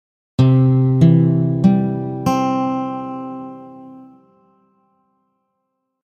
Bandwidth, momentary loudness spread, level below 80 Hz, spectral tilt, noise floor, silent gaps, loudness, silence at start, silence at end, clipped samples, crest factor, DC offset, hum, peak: 8 kHz; 19 LU; -50 dBFS; -9 dB/octave; -74 dBFS; none; -16 LUFS; 0.4 s; 2 s; under 0.1%; 18 dB; under 0.1%; none; 0 dBFS